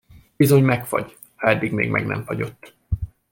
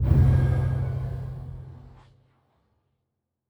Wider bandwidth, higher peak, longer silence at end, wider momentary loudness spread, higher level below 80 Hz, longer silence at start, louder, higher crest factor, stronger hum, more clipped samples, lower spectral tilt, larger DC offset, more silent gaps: first, 17 kHz vs 4.3 kHz; first, -4 dBFS vs -8 dBFS; second, 0.25 s vs 1.7 s; second, 13 LU vs 22 LU; second, -40 dBFS vs -34 dBFS; first, 0.4 s vs 0 s; first, -21 LUFS vs -25 LUFS; about the same, 18 dB vs 18 dB; neither; neither; second, -6.5 dB/octave vs -10 dB/octave; neither; neither